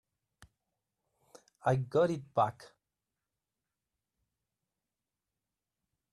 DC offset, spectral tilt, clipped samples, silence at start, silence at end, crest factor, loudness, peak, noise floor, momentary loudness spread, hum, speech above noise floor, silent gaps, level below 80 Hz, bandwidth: under 0.1%; -7.5 dB/octave; under 0.1%; 1.65 s; 3.5 s; 22 dB; -32 LUFS; -16 dBFS; under -90 dBFS; 4 LU; none; over 59 dB; none; -74 dBFS; 12 kHz